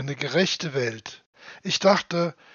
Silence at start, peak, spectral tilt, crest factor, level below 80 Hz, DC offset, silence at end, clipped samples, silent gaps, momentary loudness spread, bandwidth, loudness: 0 s; -4 dBFS; -3 dB/octave; 22 dB; -70 dBFS; under 0.1%; 0.2 s; under 0.1%; 1.26-1.33 s; 17 LU; 7.4 kHz; -24 LUFS